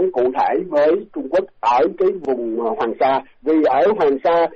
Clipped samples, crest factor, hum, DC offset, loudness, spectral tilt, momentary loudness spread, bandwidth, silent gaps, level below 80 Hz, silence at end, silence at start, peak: under 0.1%; 10 dB; none; under 0.1%; -18 LUFS; -3.5 dB/octave; 6 LU; 7 kHz; none; -56 dBFS; 0 s; 0 s; -8 dBFS